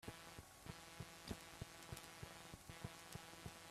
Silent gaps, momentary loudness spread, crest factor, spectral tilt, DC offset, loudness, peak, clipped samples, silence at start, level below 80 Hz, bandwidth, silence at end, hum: none; 4 LU; 24 dB; -3.5 dB/octave; under 0.1%; -56 LUFS; -32 dBFS; under 0.1%; 0 s; -68 dBFS; 15.5 kHz; 0 s; none